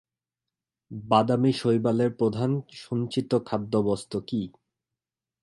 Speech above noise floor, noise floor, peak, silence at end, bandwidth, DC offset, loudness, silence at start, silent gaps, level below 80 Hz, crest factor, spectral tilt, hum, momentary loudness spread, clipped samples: 64 dB; -89 dBFS; -6 dBFS; 0.95 s; 11.5 kHz; under 0.1%; -26 LUFS; 0.9 s; none; -62 dBFS; 20 dB; -7.5 dB/octave; none; 9 LU; under 0.1%